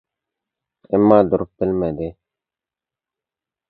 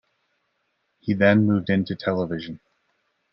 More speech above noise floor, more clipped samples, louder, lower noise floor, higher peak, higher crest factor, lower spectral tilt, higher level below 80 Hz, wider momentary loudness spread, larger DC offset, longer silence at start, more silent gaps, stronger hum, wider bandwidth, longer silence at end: first, 72 dB vs 52 dB; neither; first, -17 LUFS vs -22 LUFS; first, -89 dBFS vs -73 dBFS; first, 0 dBFS vs -4 dBFS; about the same, 20 dB vs 20 dB; first, -11.5 dB/octave vs -9.5 dB/octave; first, -48 dBFS vs -64 dBFS; second, 14 LU vs 17 LU; neither; second, 0.9 s vs 1.05 s; neither; neither; second, 4.6 kHz vs 5.8 kHz; first, 1.6 s vs 0.75 s